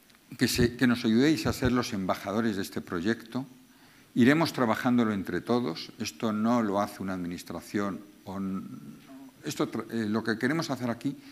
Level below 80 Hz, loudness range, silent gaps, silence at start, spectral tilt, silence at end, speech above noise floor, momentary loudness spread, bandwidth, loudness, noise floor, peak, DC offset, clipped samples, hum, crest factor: -54 dBFS; 6 LU; none; 0.3 s; -5.5 dB/octave; 0 s; 28 dB; 14 LU; 15.5 kHz; -29 LUFS; -57 dBFS; -8 dBFS; under 0.1%; under 0.1%; none; 22 dB